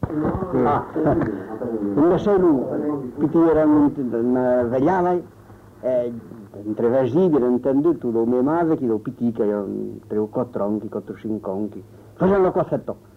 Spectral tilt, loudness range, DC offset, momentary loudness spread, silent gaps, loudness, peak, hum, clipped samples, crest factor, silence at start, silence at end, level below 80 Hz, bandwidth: -10 dB/octave; 5 LU; under 0.1%; 12 LU; none; -21 LUFS; -8 dBFS; none; under 0.1%; 12 dB; 0 s; 0.2 s; -48 dBFS; 6.6 kHz